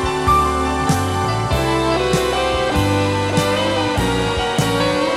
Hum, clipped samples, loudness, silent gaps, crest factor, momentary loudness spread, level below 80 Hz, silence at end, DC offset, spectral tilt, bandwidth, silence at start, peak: none; under 0.1%; -17 LUFS; none; 14 dB; 3 LU; -30 dBFS; 0 s; under 0.1%; -5 dB/octave; 16 kHz; 0 s; -4 dBFS